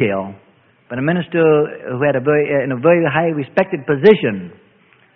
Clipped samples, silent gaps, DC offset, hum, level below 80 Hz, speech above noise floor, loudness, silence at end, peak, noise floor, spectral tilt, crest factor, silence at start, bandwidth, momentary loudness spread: under 0.1%; none; under 0.1%; none; -58 dBFS; 37 dB; -16 LUFS; 0.65 s; 0 dBFS; -52 dBFS; -9.5 dB/octave; 16 dB; 0 s; 5 kHz; 12 LU